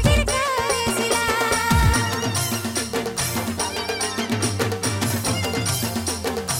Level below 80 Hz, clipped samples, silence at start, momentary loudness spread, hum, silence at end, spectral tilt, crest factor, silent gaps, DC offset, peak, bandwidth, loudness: -32 dBFS; under 0.1%; 0 s; 6 LU; none; 0 s; -3.5 dB/octave; 16 dB; none; under 0.1%; -6 dBFS; 17 kHz; -22 LUFS